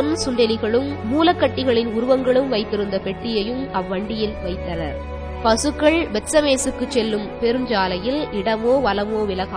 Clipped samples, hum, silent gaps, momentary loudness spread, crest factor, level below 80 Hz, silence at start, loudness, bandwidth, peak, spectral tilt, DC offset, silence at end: under 0.1%; none; none; 8 LU; 18 dB; -38 dBFS; 0 s; -20 LUFS; 11 kHz; -2 dBFS; -4.5 dB/octave; under 0.1%; 0 s